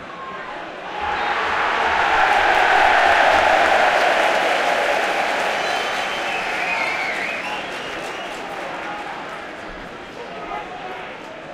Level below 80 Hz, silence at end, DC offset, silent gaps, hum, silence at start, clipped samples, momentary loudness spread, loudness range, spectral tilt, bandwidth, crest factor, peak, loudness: -50 dBFS; 0 s; under 0.1%; none; none; 0 s; under 0.1%; 18 LU; 14 LU; -2 dB/octave; 16.5 kHz; 18 dB; -2 dBFS; -18 LUFS